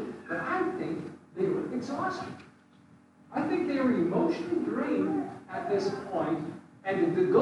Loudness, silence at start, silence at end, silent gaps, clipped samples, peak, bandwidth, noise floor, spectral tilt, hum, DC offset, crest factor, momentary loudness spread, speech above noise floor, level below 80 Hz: -31 LUFS; 0 s; 0 s; none; under 0.1%; -12 dBFS; 11 kHz; -58 dBFS; -7.5 dB/octave; none; under 0.1%; 18 dB; 11 LU; 30 dB; -74 dBFS